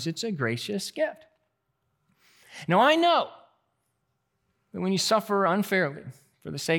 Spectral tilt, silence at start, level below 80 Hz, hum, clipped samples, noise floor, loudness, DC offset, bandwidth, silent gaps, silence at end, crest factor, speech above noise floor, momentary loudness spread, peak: -4.5 dB/octave; 0 s; -78 dBFS; none; under 0.1%; -77 dBFS; -25 LUFS; under 0.1%; 18 kHz; none; 0 s; 20 dB; 51 dB; 18 LU; -8 dBFS